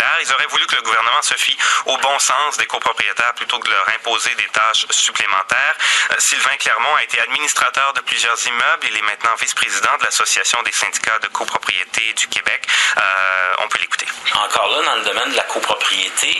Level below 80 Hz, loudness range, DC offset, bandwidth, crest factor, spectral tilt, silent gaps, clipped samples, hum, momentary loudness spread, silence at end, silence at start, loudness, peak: -64 dBFS; 2 LU; under 0.1%; 13.5 kHz; 18 dB; 2 dB/octave; none; under 0.1%; none; 4 LU; 0 s; 0 s; -15 LUFS; 0 dBFS